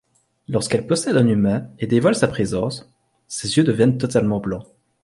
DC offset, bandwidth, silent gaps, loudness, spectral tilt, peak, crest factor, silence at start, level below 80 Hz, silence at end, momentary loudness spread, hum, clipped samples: under 0.1%; 11.5 kHz; none; -20 LUFS; -6 dB/octave; -2 dBFS; 18 dB; 0.5 s; -50 dBFS; 0.4 s; 11 LU; none; under 0.1%